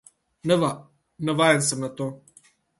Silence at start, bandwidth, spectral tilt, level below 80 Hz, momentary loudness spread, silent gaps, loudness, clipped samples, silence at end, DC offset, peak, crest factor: 0.45 s; 12 kHz; -4 dB/octave; -66 dBFS; 14 LU; none; -24 LUFS; under 0.1%; 0.6 s; under 0.1%; -4 dBFS; 22 dB